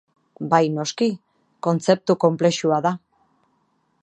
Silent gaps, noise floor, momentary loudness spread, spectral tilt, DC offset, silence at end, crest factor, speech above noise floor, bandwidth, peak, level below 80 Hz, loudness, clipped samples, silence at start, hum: none; -67 dBFS; 11 LU; -5.5 dB/octave; under 0.1%; 1.05 s; 20 dB; 47 dB; 10 kHz; -2 dBFS; -72 dBFS; -21 LUFS; under 0.1%; 0.4 s; none